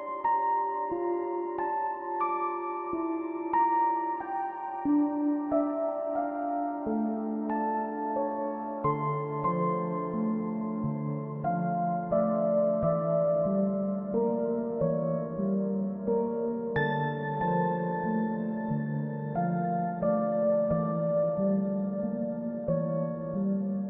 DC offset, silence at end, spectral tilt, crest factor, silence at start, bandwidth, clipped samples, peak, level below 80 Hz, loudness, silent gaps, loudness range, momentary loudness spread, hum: under 0.1%; 0 s; -12 dB/octave; 14 dB; 0 s; 3.8 kHz; under 0.1%; -16 dBFS; -62 dBFS; -30 LUFS; none; 3 LU; 6 LU; none